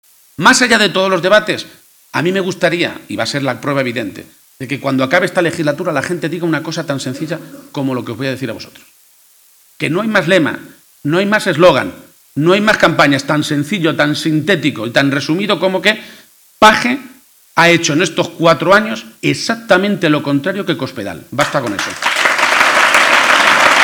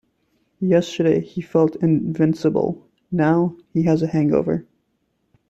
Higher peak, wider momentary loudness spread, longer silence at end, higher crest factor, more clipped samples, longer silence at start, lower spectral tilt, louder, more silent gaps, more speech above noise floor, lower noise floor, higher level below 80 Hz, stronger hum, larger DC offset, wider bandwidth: first, 0 dBFS vs -4 dBFS; first, 13 LU vs 8 LU; second, 0 s vs 0.85 s; about the same, 14 dB vs 16 dB; first, 0.1% vs under 0.1%; second, 0.4 s vs 0.6 s; second, -4 dB/octave vs -8 dB/octave; first, -13 LUFS vs -20 LUFS; neither; second, 35 dB vs 50 dB; second, -48 dBFS vs -69 dBFS; about the same, -52 dBFS vs -56 dBFS; neither; neither; first, over 20 kHz vs 8 kHz